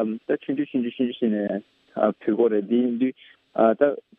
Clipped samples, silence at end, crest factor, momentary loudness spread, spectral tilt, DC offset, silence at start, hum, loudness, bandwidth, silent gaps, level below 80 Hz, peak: under 0.1%; 0.2 s; 18 dB; 8 LU; -10 dB/octave; under 0.1%; 0 s; none; -24 LUFS; 3.9 kHz; none; -76 dBFS; -6 dBFS